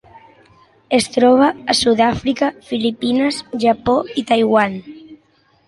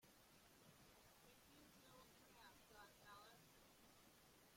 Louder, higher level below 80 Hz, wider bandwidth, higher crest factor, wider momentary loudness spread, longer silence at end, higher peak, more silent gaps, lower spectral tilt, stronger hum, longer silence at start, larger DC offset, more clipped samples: first, -16 LUFS vs -68 LUFS; first, -48 dBFS vs -84 dBFS; second, 11.5 kHz vs 16.5 kHz; about the same, 16 dB vs 16 dB; about the same, 7 LU vs 5 LU; first, 0.5 s vs 0 s; first, -2 dBFS vs -52 dBFS; neither; about the same, -4 dB/octave vs -3 dB/octave; neither; first, 0.9 s vs 0 s; neither; neither